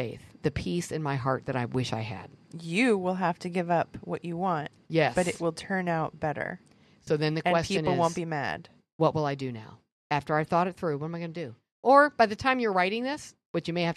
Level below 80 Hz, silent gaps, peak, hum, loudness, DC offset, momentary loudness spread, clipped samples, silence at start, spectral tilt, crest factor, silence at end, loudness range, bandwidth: -60 dBFS; 8.92-8.99 s, 9.92-10.10 s, 11.72-11.83 s, 13.46-13.54 s; -6 dBFS; none; -28 LUFS; under 0.1%; 12 LU; under 0.1%; 0 s; -6 dB/octave; 22 dB; 0 s; 4 LU; 12.5 kHz